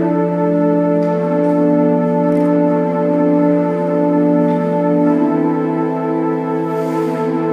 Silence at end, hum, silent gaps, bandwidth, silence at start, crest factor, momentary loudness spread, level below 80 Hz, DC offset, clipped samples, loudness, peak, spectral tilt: 0 s; none; none; 6 kHz; 0 s; 12 dB; 4 LU; -66 dBFS; under 0.1%; under 0.1%; -15 LUFS; -2 dBFS; -10 dB/octave